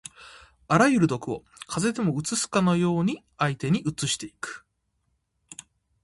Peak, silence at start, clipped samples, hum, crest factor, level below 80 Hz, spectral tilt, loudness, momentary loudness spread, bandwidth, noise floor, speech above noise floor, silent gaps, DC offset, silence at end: -6 dBFS; 0.2 s; under 0.1%; none; 22 dB; -58 dBFS; -5 dB/octave; -25 LUFS; 22 LU; 11.5 kHz; -74 dBFS; 49 dB; none; under 0.1%; 0.5 s